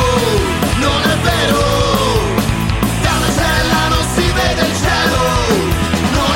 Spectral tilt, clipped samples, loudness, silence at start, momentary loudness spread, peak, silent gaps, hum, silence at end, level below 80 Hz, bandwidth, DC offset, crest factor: -4.5 dB/octave; under 0.1%; -14 LUFS; 0 s; 2 LU; -2 dBFS; none; none; 0 s; -24 dBFS; 17 kHz; under 0.1%; 12 dB